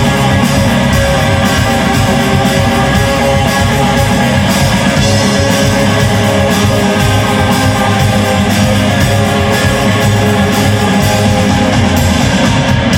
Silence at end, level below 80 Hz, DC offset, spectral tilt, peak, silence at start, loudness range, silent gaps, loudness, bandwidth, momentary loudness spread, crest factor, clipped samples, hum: 0 s; -24 dBFS; under 0.1%; -5 dB/octave; 0 dBFS; 0 s; 0 LU; none; -10 LUFS; 17 kHz; 1 LU; 10 dB; under 0.1%; none